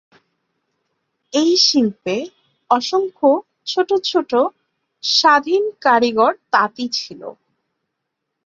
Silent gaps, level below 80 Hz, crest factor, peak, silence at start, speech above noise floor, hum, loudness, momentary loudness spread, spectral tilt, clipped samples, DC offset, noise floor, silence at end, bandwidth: none; -66 dBFS; 18 dB; -2 dBFS; 1.35 s; 61 dB; none; -17 LUFS; 11 LU; -2.5 dB/octave; under 0.1%; under 0.1%; -77 dBFS; 1.15 s; 7.6 kHz